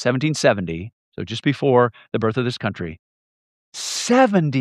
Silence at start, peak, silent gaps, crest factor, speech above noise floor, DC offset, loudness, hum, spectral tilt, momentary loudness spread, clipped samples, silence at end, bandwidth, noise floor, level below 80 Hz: 0 s; -2 dBFS; 0.93-1.12 s, 2.99-3.72 s; 20 dB; over 71 dB; under 0.1%; -20 LUFS; none; -5 dB/octave; 16 LU; under 0.1%; 0 s; 14.5 kHz; under -90 dBFS; -56 dBFS